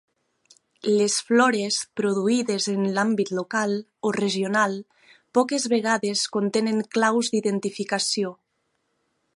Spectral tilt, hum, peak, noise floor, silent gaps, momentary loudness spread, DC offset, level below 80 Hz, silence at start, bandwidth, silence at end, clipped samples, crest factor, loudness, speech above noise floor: -3.5 dB/octave; none; -6 dBFS; -74 dBFS; none; 6 LU; under 0.1%; -74 dBFS; 0.85 s; 11.5 kHz; 1.05 s; under 0.1%; 18 dB; -23 LUFS; 51 dB